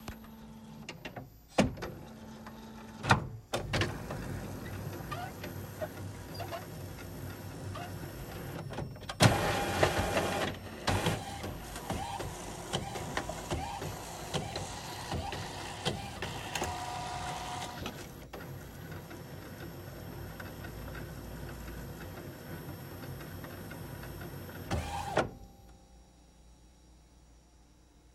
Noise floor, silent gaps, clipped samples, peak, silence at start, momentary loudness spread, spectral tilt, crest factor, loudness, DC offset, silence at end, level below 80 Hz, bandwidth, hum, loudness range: -60 dBFS; none; under 0.1%; -8 dBFS; 0 s; 15 LU; -4.5 dB/octave; 30 dB; -37 LUFS; under 0.1%; 0 s; -52 dBFS; 16 kHz; none; 13 LU